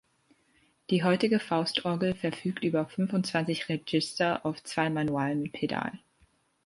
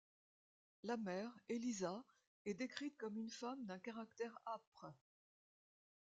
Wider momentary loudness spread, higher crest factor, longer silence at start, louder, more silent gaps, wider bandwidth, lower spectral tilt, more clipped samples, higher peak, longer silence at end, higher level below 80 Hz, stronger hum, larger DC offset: second, 6 LU vs 9 LU; about the same, 18 dB vs 22 dB; about the same, 0.9 s vs 0.85 s; first, -29 LUFS vs -49 LUFS; second, none vs 2.27-2.45 s, 4.67-4.72 s; first, 11.5 kHz vs 9 kHz; about the same, -5.5 dB/octave vs -4.5 dB/octave; neither; first, -12 dBFS vs -28 dBFS; second, 0.7 s vs 1.15 s; first, -66 dBFS vs -90 dBFS; neither; neither